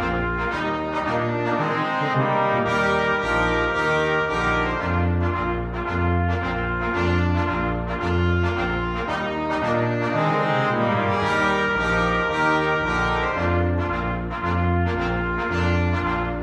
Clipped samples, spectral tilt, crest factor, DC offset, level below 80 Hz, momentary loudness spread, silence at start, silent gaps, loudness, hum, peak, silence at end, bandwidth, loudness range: under 0.1%; -6.5 dB/octave; 14 dB; under 0.1%; -36 dBFS; 5 LU; 0 s; none; -22 LUFS; none; -8 dBFS; 0 s; 8.8 kHz; 2 LU